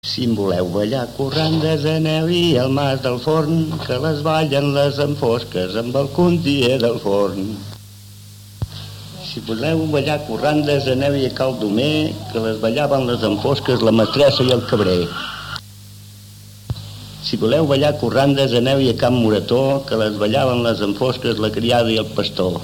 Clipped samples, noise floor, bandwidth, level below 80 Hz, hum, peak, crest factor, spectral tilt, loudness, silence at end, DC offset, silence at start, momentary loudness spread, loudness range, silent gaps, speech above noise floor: under 0.1%; -39 dBFS; 18 kHz; -46 dBFS; 50 Hz at -50 dBFS; -6 dBFS; 12 dB; -6 dB/octave; -18 LUFS; 0 s; under 0.1%; 0.05 s; 12 LU; 5 LU; none; 22 dB